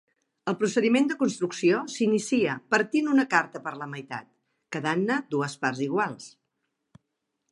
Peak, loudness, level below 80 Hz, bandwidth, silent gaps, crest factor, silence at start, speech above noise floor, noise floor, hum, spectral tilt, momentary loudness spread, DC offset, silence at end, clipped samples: -6 dBFS; -26 LUFS; -76 dBFS; 11.5 kHz; none; 22 dB; 0.45 s; 55 dB; -80 dBFS; none; -5 dB/octave; 14 LU; under 0.1%; 1.2 s; under 0.1%